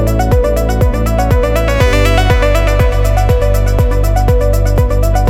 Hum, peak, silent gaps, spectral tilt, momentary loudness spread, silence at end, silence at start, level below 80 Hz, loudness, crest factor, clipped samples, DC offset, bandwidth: none; 0 dBFS; none; -6 dB/octave; 2 LU; 0 s; 0 s; -12 dBFS; -12 LUFS; 10 dB; under 0.1%; under 0.1%; 15.5 kHz